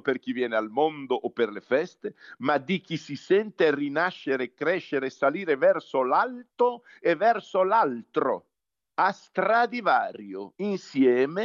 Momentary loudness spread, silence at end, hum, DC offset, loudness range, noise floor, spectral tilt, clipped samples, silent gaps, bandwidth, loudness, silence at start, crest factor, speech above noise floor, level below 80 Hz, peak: 9 LU; 0 s; none; under 0.1%; 2 LU; -76 dBFS; -6 dB/octave; under 0.1%; none; 7.4 kHz; -26 LUFS; 0.05 s; 16 dB; 50 dB; -86 dBFS; -10 dBFS